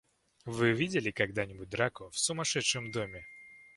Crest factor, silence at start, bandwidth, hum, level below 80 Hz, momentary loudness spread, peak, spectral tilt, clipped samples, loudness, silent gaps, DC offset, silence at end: 22 dB; 0.45 s; 11.5 kHz; none; -62 dBFS; 17 LU; -12 dBFS; -3.5 dB/octave; under 0.1%; -32 LUFS; none; under 0.1%; 0.1 s